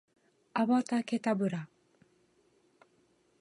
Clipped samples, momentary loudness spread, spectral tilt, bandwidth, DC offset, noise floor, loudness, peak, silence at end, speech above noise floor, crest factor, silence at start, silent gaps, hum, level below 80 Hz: under 0.1%; 11 LU; -6.5 dB/octave; 11 kHz; under 0.1%; -70 dBFS; -32 LUFS; -16 dBFS; 1.75 s; 40 dB; 18 dB; 0.55 s; none; none; -82 dBFS